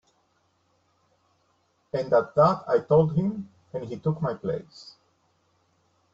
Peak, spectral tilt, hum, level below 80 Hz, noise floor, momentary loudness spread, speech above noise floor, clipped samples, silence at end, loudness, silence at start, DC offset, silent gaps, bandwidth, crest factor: -8 dBFS; -9 dB/octave; none; -60 dBFS; -69 dBFS; 17 LU; 45 dB; under 0.1%; 1.3 s; -25 LUFS; 1.95 s; under 0.1%; none; 7.4 kHz; 20 dB